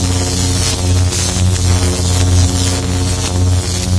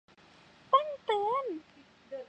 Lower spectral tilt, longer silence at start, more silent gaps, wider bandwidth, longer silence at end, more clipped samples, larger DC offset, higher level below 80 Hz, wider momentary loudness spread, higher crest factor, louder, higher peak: about the same, -4 dB/octave vs -4.5 dB/octave; second, 0 s vs 0.7 s; neither; first, 11 kHz vs 8.8 kHz; about the same, 0 s vs 0.05 s; neither; neither; first, -24 dBFS vs -78 dBFS; second, 3 LU vs 15 LU; second, 12 dB vs 22 dB; first, -14 LUFS vs -31 LUFS; first, 0 dBFS vs -12 dBFS